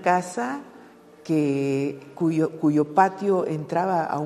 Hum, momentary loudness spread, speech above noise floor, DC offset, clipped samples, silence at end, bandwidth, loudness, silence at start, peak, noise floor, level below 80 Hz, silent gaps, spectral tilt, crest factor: none; 9 LU; 25 dB; under 0.1%; under 0.1%; 0 s; 13 kHz; -24 LUFS; 0 s; -4 dBFS; -48 dBFS; -72 dBFS; none; -7 dB/octave; 20 dB